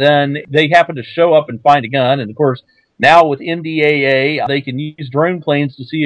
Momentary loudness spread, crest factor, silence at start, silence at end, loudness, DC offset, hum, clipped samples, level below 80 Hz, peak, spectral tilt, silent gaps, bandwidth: 9 LU; 14 dB; 0 s; 0 s; -13 LUFS; under 0.1%; none; 0.4%; -56 dBFS; 0 dBFS; -6.5 dB/octave; none; 9.2 kHz